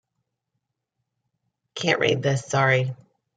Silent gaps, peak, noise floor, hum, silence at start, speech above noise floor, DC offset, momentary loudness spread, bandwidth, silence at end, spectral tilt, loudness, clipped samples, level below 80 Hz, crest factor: none; -6 dBFS; -80 dBFS; none; 1.75 s; 58 dB; under 0.1%; 10 LU; 9.4 kHz; 0.4 s; -5 dB/octave; -22 LUFS; under 0.1%; -68 dBFS; 20 dB